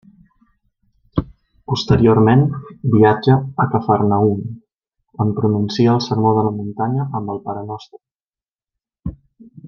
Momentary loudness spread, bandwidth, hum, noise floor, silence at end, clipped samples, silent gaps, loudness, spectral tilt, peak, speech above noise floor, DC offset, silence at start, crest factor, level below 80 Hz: 18 LU; 7.2 kHz; none; under -90 dBFS; 0 s; under 0.1%; 8.21-8.31 s, 8.49-8.56 s; -17 LUFS; -8 dB/octave; -2 dBFS; over 74 dB; under 0.1%; 1.15 s; 16 dB; -44 dBFS